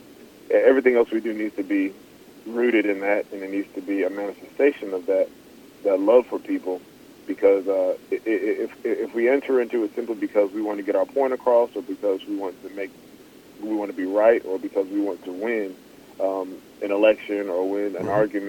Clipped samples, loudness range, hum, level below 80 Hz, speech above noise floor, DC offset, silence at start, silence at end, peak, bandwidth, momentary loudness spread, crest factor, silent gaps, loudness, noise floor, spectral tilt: under 0.1%; 3 LU; none; -66 dBFS; 25 dB; under 0.1%; 0.1 s; 0 s; -4 dBFS; 18.5 kHz; 12 LU; 20 dB; none; -23 LUFS; -47 dBFS; -6 dB/octave